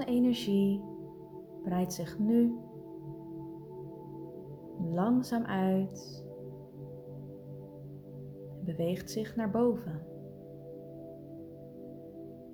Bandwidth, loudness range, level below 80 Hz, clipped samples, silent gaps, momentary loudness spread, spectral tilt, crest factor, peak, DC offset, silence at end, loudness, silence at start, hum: 19.5 kHz; 5 LU; -64 dBFS; under 0.1%; none; 18 LU; -7 dB/octave; 18 dB; -16 dBFS; under 0.1%; 0 s; -32 LUFS; 0 s; none